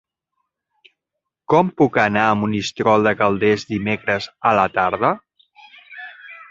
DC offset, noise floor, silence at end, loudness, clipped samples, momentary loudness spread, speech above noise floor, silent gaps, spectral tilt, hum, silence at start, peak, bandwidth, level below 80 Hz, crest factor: under 0.1%; -81 dBFS; 0.05 s; -18 LUFS; under 0.1%; 20 LU; 64 dB; none; -6 dB/octave; none; 1.5 s; -2 dBFS; 7.8 kHz; -54 dBFS; 18 dB